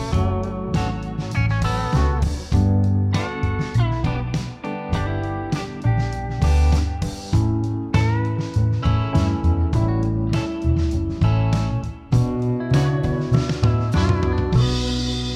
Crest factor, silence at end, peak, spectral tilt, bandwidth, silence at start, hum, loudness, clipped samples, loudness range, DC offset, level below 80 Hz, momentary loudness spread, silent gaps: 14 dB; 0 s; -6 dBFS; -7 dB/octave; 10.5 kHz; 0 s; none; -21 LUFS; under 0.1%; 2 LU; under 0.1%; -26 dBFS; 6 LU; none